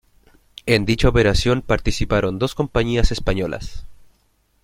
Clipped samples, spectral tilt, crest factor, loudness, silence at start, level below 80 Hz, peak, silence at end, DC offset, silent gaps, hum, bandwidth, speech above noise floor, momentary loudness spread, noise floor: under 0.1%; -5.5 dB/octave; 18 dB; -20 LUFS; 0.65 s; -28 dBFS; -2 dBFS; 0.7 s; under 0.1%; none; none; 15.5 kHz; 44 dB; 10 LU; -62 dBFS